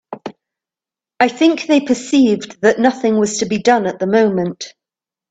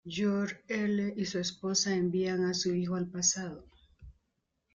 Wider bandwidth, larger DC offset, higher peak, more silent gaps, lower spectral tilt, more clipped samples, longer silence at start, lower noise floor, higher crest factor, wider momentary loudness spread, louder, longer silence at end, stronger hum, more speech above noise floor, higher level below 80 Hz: about the same, 9.2 kHz vs 9.6 kHz; neither; first, 0 dBFS vs -14 dBFS; neither; about the same, -4.5 dB/octave vs -4 dB/octave; neither; about the same, 0.1 s vs 0.05 s; first, -89 dBFS vs -81 dBFS; about the same, 16 dB vs 18 dB; first, 17 LU vs 6 LU; first, -15 LUFS vs -31 LUFS; about the same, 0.6 s vs 0.65 s; neither; first, 74 dB vs 49 dB; first, -58 dBFS vs -64 dBFS